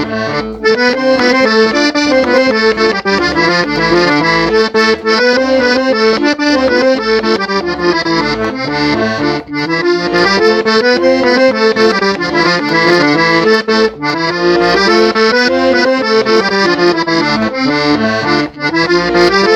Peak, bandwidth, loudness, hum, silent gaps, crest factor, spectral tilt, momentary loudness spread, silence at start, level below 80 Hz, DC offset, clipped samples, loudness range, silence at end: 0 dBFS; 9.6 kHz; -10 LUFS; none; none; 10 dB; -4.5 dB/octave; 5 LU; 0 s; -40 dBFS; under 0.1%; under 0.1%; 2 LU; 0 s